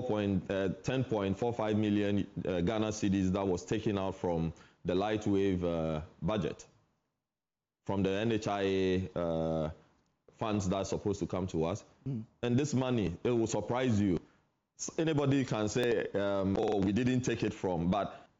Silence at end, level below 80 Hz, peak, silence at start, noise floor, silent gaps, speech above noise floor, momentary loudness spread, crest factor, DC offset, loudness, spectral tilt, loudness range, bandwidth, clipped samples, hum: 0.15 s; -60 dBFS; -20 dBFS; 0 s; under -90 dBFS; none; over 58 dB; 7 LU; 12 dB; under 0.1%; -33 LUFS; -6.5 dB/octave; 3 LU; 8 kHz; under 0.1%; none